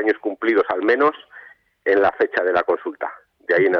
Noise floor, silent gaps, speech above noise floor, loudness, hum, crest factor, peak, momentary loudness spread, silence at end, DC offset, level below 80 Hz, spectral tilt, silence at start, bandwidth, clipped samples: -46 dBFS; none; 27 dB; -20 LUFS; none; 12 dB; -8 dBFS; 13 LU; 0 s; under 0.1%; -62 dBFS; -7 dB/octave; 0 s; 6.2 kHz; under 0.1%